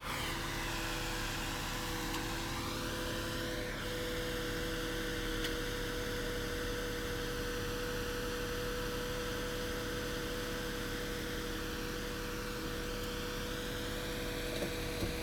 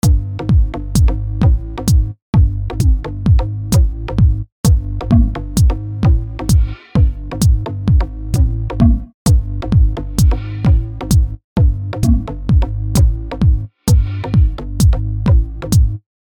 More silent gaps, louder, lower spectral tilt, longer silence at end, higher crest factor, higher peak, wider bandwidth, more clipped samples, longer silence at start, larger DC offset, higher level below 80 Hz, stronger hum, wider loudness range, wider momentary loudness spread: second, none vs 2.22-2.33 s, 4.52-4.64 s, 9.14-9.25 s, 11.44-11.56 s; second, -38 LUFS vs -16 LUFS; second, -3.5 dB/octave vs -7 dB/octave; second, 0 s vs 0.25 s; about the same, 16 dB vs 14 dB; second, -22 dBFS vs 0 dBFS; first, over 20 kHz vs 17.5 kHz; neither; about the same, 0 s vs 0.05 s; neither; second, -46 dBFS vs -16 dBFS; neither; about the same, 2 LU vs 1 LU; about the same, 2 LU vs 3 LU